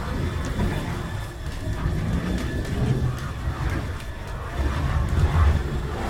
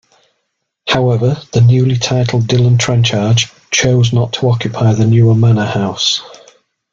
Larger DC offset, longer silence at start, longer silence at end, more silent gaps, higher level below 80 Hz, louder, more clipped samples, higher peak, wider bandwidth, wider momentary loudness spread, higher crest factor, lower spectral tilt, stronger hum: neither; second, 0 s vs 0.85 s; second, 0 s vs 0.65 s; neither; first, -28 dBFS vs -44 dBFS; second, -26 LUFS vs -12 LUFS; neither; second, -8 dBFS vs 0 dBFS; first, 15.5 kHz vs 7.6 kHz; first, 10 LU vs 5 LU; about the same, 16 dB vs 12 dB; about the same, -6.5 dB/octave vs -5.5 dB/octave; neither